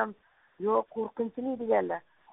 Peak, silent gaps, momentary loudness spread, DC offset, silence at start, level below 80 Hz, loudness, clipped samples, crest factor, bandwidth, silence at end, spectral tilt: -12 dBFS; none; 8 LU; under 0.1%; 0 s; -74 dBFS; -31 LUFS; under 0.1%; 18 dB; 3.9 kHz; 0.35 s; -1.5 dB/octave